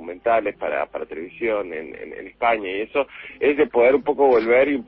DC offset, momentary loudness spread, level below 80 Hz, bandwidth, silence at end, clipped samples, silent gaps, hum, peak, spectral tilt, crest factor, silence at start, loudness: under 0.1%; 15 LU; -56 dBFS; 5.6 kHz; 0.05 s; under 0.1%; none; none; -6 dBFS; -8.5 dB/octave; 16 dB; 0 s; -20 LUFS